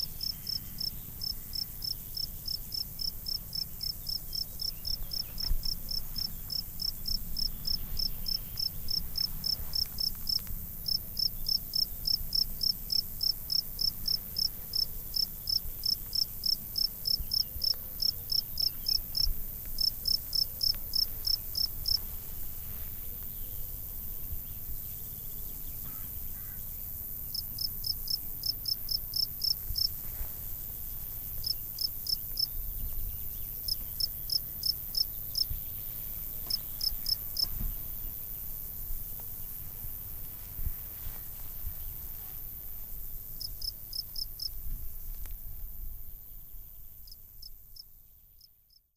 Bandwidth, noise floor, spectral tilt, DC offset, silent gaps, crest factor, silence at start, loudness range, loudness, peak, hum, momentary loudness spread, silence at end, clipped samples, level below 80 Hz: 16 kHz; -64 dBFS; -1.5 dB/octave; under 0.1%; none; 18 dB; 0 s; 10 LU; -32 LUFS; -16 dBFS; none; 11 LU; 0.5 s; under 0.1%; -42 dBFS